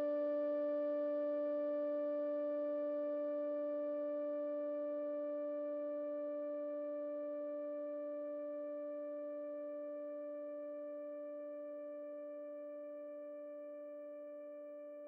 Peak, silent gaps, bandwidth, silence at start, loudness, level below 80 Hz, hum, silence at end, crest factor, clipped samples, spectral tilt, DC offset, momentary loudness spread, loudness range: -32 dBFS; none; 3.7 kHz; 0 s; -42 LUFS; under -90 dBFS; none; 0 s; 10 dB; under 0.1%; -6.5 dB/octave; under 0.1%; 11 LU; 9 LU